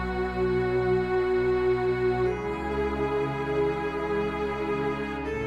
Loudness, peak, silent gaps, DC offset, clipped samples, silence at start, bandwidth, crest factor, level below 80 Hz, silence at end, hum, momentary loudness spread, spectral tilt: -27 LUFS; -16 dBFS; none; under 0.1%; under 0.1%; 0 s; 9.2 kHz; 12 dB; -42 dBFS; 0 s; none; 5 LU; -7.5 dB/octave